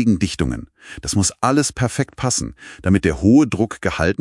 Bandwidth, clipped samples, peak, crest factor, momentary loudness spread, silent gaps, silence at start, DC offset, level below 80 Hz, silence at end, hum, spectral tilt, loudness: 12 kHz; under 0.1%; -2 dBFS; 18 dB; 13 LU; none; 0 s; under 0.1%; -38 dBFS; 0.05 s; none; -5 dB/octave; -18 LUFS